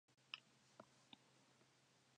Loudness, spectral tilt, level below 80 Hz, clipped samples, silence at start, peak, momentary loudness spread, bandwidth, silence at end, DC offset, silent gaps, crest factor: -61 LUFS; -2 dB/octave; under -90 dBFS; under 0.1%; 0.1 s; -32 dBFS; 10 LU; 10 kHz; 0 s; under 0.1%; none; 34 dB